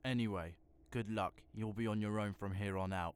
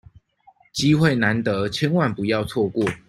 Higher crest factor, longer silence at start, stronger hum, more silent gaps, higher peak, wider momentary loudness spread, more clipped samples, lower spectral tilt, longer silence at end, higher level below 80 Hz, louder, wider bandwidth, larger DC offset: about the same, 14 dB vs 18 dB; second, 0.05 s vs 0.75 s; neither; neither; second, -26 dBFS vs -4 dBFS; about the same, 7 LU vs 6 LU; neither; about the same, -7 dB/octave vs -6 dB/octave; about the same, 0.05 s vs 0.1 s; second, -64 dBFS vs -52 dBFS; second, -41 LUFS vs -21 LUFS; about the same, 13.5 kHz vs 13.5 kHz; neither